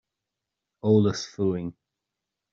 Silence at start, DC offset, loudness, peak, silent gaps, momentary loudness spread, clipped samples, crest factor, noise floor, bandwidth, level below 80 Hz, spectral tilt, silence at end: 0.85 s; under 0.1%; -25 LUFS; -8 dBFS; none; 11 LU; under 0.1%; 20 dB; -86 dBFS; 7.6 kHz; -64 dBFS; -7 dB/octave; 0.8 s